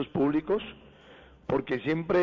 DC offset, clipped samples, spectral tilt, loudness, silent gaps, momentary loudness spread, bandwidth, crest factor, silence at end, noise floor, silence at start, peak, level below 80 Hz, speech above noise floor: under 0.1%; under 0.1%; -8.5 dB/octave; -29 LUFS; none; 12 LU; 7 kHz; 12 dB; 0 s; -53 dBFS; 0 s; -16 dBFS; -58 dBFS; 26 dB